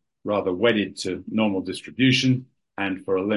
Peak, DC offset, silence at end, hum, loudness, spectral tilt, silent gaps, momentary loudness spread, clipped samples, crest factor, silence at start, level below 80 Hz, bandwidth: -6 dBFS; under 0.1%; 0 s; none; -23 LUFS; -5.5 dB/octave; none; 10 LU; under 0.1%; 16 dB; 0.25 s; -58 dBFS; 11.5 kHz